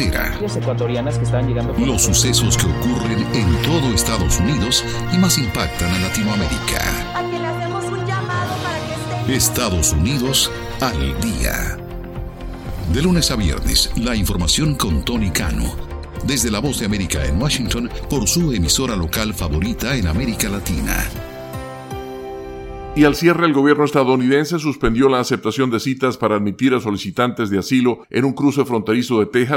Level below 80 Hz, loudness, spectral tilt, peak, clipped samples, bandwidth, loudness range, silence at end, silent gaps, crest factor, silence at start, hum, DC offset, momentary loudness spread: -28 dBFS; -18 LUFS; -4.5 dB/octave; 0 dBFS; under 0.1%; 17 kHz; 4 LU; 0 s; none; 18 dB; 0 s; none; under 0.1%; 11 LU